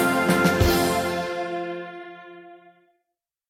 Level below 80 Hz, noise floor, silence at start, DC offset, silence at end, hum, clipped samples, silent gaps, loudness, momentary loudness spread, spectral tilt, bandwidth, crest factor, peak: -40 dBFS; -82 dBFS; 0 s; under 0.1%; 0.95 s; none; under 0.1%; none; -22 LUFS; 22 LU; -5 dB/octave; 17 kHz; 18 dB; -6 dBFS